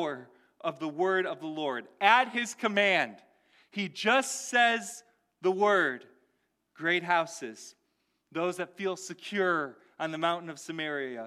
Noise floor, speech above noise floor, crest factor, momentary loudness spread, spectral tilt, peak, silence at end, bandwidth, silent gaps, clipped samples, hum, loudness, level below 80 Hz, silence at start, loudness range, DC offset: -77 dBFS; 47 dB; 22 dB; 15 LU; -3 dB/octave; -8 dBFS; 0 s; 15 kHz; none; under 0.1%; none; -29 LUFS; -86 dBFS; 0 s; 6 LU; under 0.1%